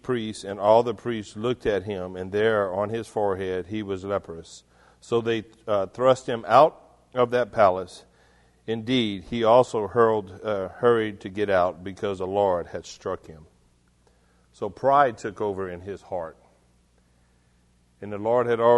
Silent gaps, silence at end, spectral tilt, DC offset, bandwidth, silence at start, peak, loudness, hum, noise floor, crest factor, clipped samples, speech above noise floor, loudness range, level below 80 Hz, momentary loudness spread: none; 0 s; -6 dB/octave; under 0.1%; 11.5 kHz; 0.05 s; -2 dBFS; -24 LUFS; 60 Hz at -60 dBFS; -62 dBFS; 22 dB; under 0.1%; 38 dB; 6 LU; -58 dBFS; 14 LU